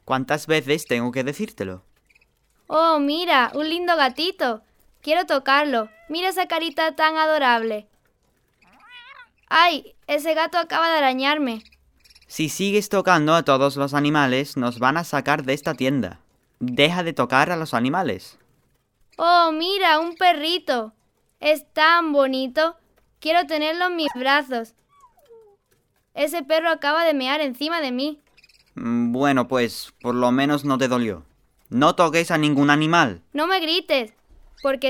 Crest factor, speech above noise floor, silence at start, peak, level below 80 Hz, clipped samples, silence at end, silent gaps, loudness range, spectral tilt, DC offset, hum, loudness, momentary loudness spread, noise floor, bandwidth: 20 dB; 45 dB; 0.05 s; -2 dBFS; -62 dBFS; under 0.1%; 0 s; none; 4 LU; -4.5 dB/octave; under 0.1%; none; -20 LUFS; 11 LU; -66 dBFS; 18 kHz